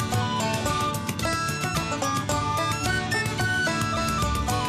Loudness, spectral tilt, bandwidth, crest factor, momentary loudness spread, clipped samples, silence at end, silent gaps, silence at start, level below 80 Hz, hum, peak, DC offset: -25 LUFS; -4 dB/octave; 15 kHz; 14 dB; 2 LU; under 0.1%; 0 s; none; 0 s; -40 dBFS; none; -12 dBFS; under 0.1%